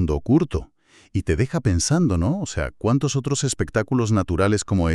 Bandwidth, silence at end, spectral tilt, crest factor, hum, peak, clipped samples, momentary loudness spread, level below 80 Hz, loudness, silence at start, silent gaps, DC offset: 12 kHz; 0 s; -5.5 dB/octave; 16 dB; none; -6 dBFS; under 0.1%; 7 LU; -36 dBFS; -22 LUFS; 0 s; none; 0.1%